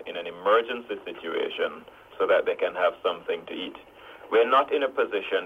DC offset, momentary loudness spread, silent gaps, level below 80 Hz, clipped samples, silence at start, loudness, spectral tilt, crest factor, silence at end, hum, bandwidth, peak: under 0.1%; 14 LU; none; -68 dBFS; under 0.1%; 0 s; -26 LUFS; -4.5 dB/octave; 18 dB; 0 s; none; 5.4 kHz; -8 dBFS